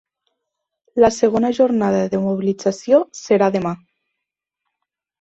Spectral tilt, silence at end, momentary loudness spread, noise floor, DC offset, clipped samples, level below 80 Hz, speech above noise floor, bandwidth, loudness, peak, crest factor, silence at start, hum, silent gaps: -6 dB/octave; 1.45 s; 8 LU; -82 dBFS; under 0.1%; under 0.1%; -56 dBFS; 65 dB; 8.2 kHz; -18 LUFS; -2 dBFS; 18 dB; 0.95 s; none; none